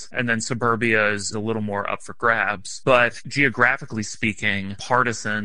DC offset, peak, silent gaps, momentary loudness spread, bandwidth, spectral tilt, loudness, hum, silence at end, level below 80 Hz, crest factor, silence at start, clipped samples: 1%; -2 dBFS; none; 9 LU; 11 kHz; -4 dB/octave; -21 LUFS; none; 0 s; -54 dBFS; 20 dB; 0 s; under 0.1%